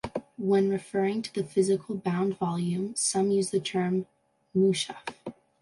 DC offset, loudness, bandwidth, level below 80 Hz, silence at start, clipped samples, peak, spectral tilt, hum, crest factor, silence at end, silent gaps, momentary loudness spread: under 0.1%; -28 LUFS; 11.5 kHz; -66 dBFS; 0.05 s; under 0.1%; -12 dBFS; -5 dB/octave; none; 16 dB; 0.3 s; none; 12 LU